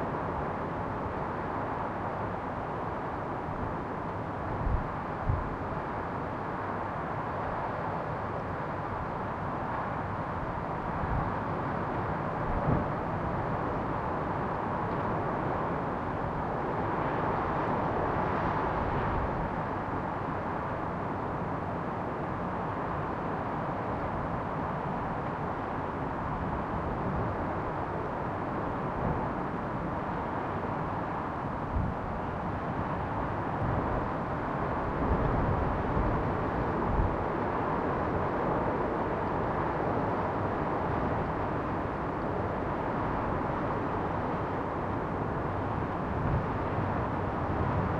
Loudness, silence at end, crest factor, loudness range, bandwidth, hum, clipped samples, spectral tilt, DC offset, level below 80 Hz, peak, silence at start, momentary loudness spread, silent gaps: -32 LUFS; 0 s; 18 dB; 4 LU; 9 kHz; none; under 0.1%; -9 dB/octave; under 0.1%; -44 dBFS; -14 dBFS; 0 s; 4 LU; none